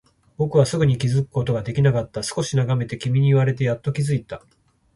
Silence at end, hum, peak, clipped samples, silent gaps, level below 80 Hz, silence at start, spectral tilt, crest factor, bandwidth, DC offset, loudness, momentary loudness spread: 0.6 s; none; -2 dBFS; under 0.1%; none; -50 dBFS; 0.4 s; -6.5 dB/octave; 18 dB; 11.5 kHz; under 0.1%; -21 LUFS; 8 LU